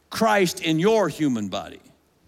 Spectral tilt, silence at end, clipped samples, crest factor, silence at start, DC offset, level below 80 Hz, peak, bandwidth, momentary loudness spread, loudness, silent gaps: -5 dB/octave; 0.5 s; under 0.1%; 14 dB; 0.1 s; under 0.1%; -62 dBFS; -8 dBFS; 16.5 kHz; 12 LU; -22 LUFS; none